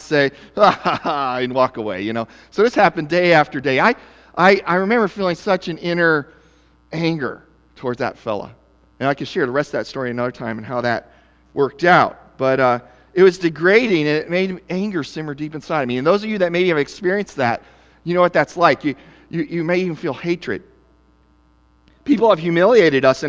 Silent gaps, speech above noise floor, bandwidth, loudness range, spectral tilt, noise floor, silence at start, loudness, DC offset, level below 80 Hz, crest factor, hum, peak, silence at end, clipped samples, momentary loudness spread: none; 38 dB; 8 kHz; 7 LU; -6 dB/octave; -55 dBFS; 0 s; -18 LUFS; under 0.1%; -54 dBFS; 18 dB; none; 0 dBFS; 0 s; under 0.1%; 13 LU